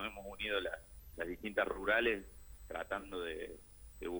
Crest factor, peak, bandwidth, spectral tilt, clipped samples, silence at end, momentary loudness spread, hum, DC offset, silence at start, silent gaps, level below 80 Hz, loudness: 20 dB; -20 dBFS; over 20 kHz; -4 dB/octave; under 0.1%; 0 s; 22 LU; none; under 0.1%; 0 s; none; -56 dBFS; -39 LUFS